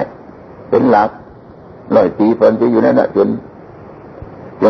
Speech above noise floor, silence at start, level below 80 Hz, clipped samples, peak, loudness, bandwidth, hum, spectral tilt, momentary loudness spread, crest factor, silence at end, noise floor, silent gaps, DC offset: 25 dB; 0 s; -50 dBFS; under 0.1%; 0 dBFS; -13 LUFS; 6.2 kHz; none; -9 dB/octave; 22 LU; 14 dB; 0 s; -37 dBFS; none; under 0.1%